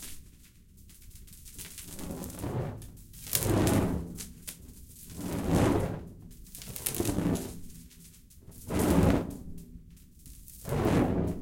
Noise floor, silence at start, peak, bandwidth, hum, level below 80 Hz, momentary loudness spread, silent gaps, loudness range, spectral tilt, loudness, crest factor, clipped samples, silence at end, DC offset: -55 dBFS; 0 s; 0 dBFS; 17 kHz; none; -44 dBFS; 24 LU; none; 4 LU; -5.5 dB/octave; -31 LUFS; 32 dB; under 0.1%; 0 s; under 0.1%